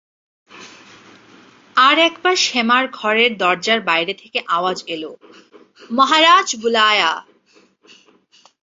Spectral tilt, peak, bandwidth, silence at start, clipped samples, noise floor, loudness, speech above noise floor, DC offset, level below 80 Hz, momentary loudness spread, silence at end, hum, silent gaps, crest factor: -1.5 dB/octave; -2 dBFS; 7.8 kHz; 0.55 s; under 0.1%; -55 dBFS; -15 LUFS; 38 dB; under 0.1%; -70 dBFS; 13 LU; 1.4 s; none; none; 18 dB